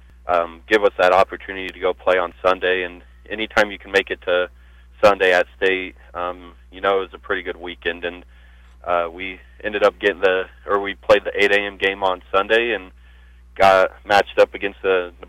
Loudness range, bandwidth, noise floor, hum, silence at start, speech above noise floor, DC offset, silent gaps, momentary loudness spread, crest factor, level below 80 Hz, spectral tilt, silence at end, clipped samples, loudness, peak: 6 LU; 15 kHz; -46 dBFS; 60 Hz at -50 dBFS; 0.25 s; 26 dB; under 0.1%; none; 13 LU; 16 dB; -46 dBFS; -4 dB/octave; 0.2 s; under 0.1%; -19 LUFS; -6 dBFS